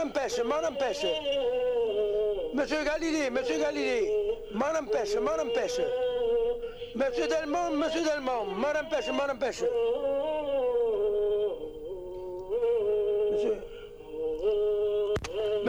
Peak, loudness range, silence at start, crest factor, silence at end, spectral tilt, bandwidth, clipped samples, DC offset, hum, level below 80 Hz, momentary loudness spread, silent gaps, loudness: -16 dBFS; 1 LU; 0 s; 12 dB; 0 s; -4 dB/octave; 12.5 kHz; under 0.1%; under 0.1%; none; -52 dBFS; 6 LU; none; -29 LUFS